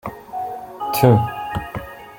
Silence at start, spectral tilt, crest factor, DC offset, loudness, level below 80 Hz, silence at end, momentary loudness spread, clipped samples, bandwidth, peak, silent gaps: 0.05 s; -7 dB/octave; 20 dB; under 0.1%; -20 LUFS; -46 dBFS; 0 s; 16 LU; under 0.1%; 17 kHz; 0 dBFS; none